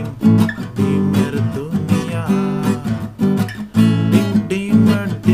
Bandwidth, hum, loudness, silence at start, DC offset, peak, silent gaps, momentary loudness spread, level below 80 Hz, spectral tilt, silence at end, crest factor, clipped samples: 16 kHz; none; -17 LUFS; 0 s; under 0.1%; 0 dBFS; none; 7 LU; -46 dBFS; -7.5 dB/octave; 0 s; 16 dB; under 0.1%